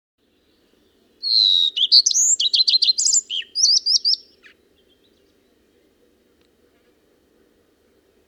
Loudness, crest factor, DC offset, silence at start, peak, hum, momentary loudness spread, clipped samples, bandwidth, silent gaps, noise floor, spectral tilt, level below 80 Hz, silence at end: -15 LUFS; 18 dB; under 0.1%; 1.25 s; -2 dBFS; none; 7 LU; under 0.1%; 16.5 kHz; none; -62 dBFS; 5.5 dB/octave; -74 dBFS; 4.1 s